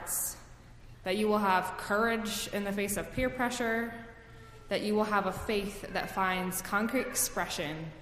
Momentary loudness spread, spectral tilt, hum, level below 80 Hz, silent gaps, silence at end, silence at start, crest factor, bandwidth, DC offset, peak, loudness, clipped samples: 10 LU; -3.5 dB/octave; none; -52 dBFS; none; 0 s; 0 s; 20 dB; 15.5 kHz; under 0.1%; -14 dBFS; -32 LUFS; under 0.1%